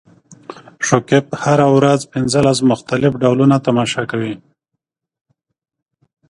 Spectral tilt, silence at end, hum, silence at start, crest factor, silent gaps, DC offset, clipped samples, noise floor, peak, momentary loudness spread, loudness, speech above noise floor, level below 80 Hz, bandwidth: -5.5 dB/octave; 1.95 s; none; 0.3 s; 16 dB; none; under 0.1%; under 0.1%; -78 dBFS; 0 dBFS; 13 LU; -15 LUFS; 64 dB; -50 dBFS; 11.5 kHz